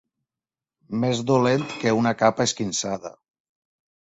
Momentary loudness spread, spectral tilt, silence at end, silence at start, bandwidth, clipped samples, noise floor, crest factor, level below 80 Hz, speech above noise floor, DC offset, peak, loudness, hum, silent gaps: 11 LU; -4.5 dB/octave; 1.1 s; 0.9 s; 8.2 kHz; under 0.1%; under -90 dBFS; 20 dB; -62 dBFS; over 68 dB; under 0.1%; -4 dBFS; -23 LUFS; none; none